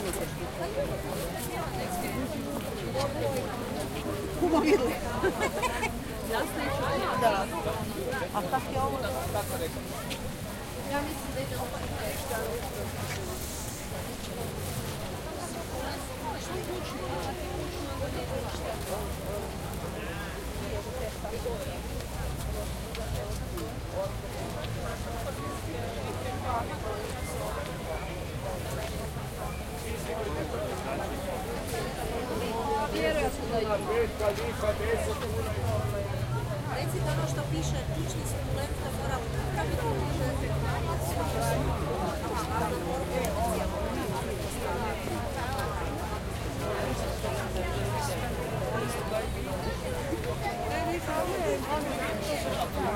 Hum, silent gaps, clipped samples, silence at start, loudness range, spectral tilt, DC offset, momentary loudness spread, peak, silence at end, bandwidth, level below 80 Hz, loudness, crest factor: none; none; under 0.1%; 0 s; 6 LU; -5 dB/octave; under 0.1%; 6 LU; -12 dBFS; 0 s; 16.5 kHz; -42 dBFS; -32 LUFS; 20 dB